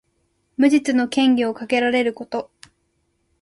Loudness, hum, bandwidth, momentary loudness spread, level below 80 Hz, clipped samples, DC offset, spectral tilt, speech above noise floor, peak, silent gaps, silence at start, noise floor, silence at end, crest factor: -19 LUFS; none; 11.5 kHz; 12 LU; -62 dBFS; under 0.1%; under 0.1%; -4 dB/octave; 50 dB; -4 dBFS; none; 0.6 s; -68 dBFS; 0.95 s; 16 dB